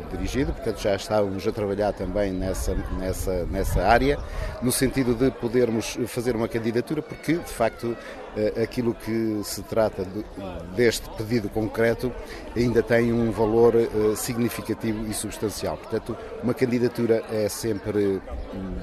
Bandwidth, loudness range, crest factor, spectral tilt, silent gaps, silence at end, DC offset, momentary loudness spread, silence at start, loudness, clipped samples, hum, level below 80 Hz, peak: 13.5 kHz; 4 LU; 20 dB; -5.5 dB/octave; none; 0 s; under 0.1%; 10 LU; 0 s; -25 LUFS; under 0.1%; none; -38 dBFS; -4 dBFS